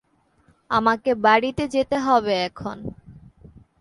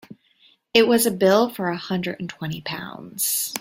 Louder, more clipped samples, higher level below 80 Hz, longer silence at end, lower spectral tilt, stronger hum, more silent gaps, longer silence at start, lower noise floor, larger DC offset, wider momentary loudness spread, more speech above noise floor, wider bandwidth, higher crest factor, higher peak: about the same, -21 LUFS vs -21 LUFS; neither; first, -52 dBFS vs -62 dBFS; first, 0.7 s vs 0 s; first, -5 dB/octave vs -3.5 dB/octave; neither; neither; first, 0.7 s vs 0.1 s; about the same, -61 dBFS vs -59 dBFS; neither; about the same, 15 LU vs 13 LU; about the same, 40 dB vs 37 dB; second, 11.5 kHz vs 16.5 kHz; about the same, 20 dB vs 20 dB; about the same, -4 dBFS vs -2 dBFS